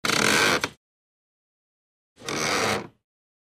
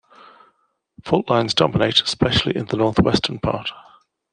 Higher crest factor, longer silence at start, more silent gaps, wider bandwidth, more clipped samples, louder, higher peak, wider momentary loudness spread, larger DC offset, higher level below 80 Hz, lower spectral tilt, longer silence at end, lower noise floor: about the same, 22 dB vs 20 dB; second, 0.05 s vs 1.05 s; first, 0.77-2.16 s vs none; first, 15.5 kHz vs 10 kHz; neither; second, -23 LUFS vs -19 LUFS; second, -6 dBFS vs -2 dBFS; first, 13 LU vs 8 LU; neither; second, -58 dBFS vs -44 dBFS; second, -2 dB/octave vs -5 dB/octave; about the same, 0.6 s vs 0.55 s; first, under -90 dBFS vs -65 dBFS